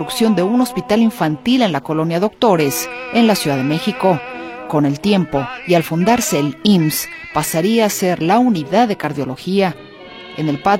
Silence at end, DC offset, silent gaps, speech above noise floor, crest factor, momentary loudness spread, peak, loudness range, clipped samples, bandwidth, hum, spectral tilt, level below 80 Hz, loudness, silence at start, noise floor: 0 s; under 0.1%; none; 20 dB; 16 dB; 8 LU; 0 dBFS; 1 LU; under 0.1%; 16.5 kHz; none; -5 dB/octave; -50 dBFS; -16 LUFS; 0 s; -35 dBFS